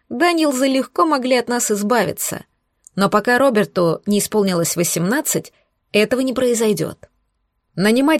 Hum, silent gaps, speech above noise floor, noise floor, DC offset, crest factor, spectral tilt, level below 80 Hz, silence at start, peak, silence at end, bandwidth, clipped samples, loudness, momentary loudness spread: none; none; 52 dB; -69 dBFS; under 0.1%; 16 dB; -4 dB/octave; -58 dBFS; 0.1 s; -2 dBFS; 0 s; 16.5 kHz; under 0.1%; -17 LUFS; 8 LU